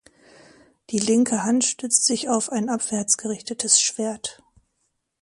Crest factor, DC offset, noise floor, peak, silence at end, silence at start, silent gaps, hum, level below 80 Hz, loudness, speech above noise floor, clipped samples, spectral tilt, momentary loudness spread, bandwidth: 22 dB; under 0.1%; -74 dBFS; -2 dBFS; 0.9 s; 0.9 s; none; none; -66 dBFS; -21 LUFS; 51 dB; under 0.1%; -2.5 dB/octave; 11 LU; 11.5 kHz